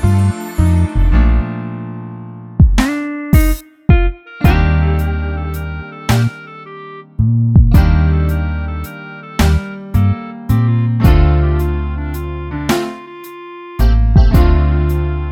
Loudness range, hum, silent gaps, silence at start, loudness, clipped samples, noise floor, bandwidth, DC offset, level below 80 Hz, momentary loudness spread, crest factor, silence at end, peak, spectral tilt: 2 LU; none; none; 0 s; -15 LUFS; under 0.1%; -32 dBFS; 17 kHz; under 0.1%; -16 dBFS; 17 LU; 12 dB; 0 s; 0 dBFS; -7.5 dB/octave